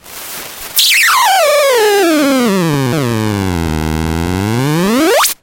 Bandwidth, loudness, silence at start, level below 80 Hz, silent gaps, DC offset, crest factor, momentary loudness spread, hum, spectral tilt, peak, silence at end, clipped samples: 17 kHz; -11 LUFS; 0.05 s; -32 dBFS; none; under 0.1%; 12 dB; 9 LU; none; -4 dB/octave; 0 dBFS; 0.1 s; under 0.1%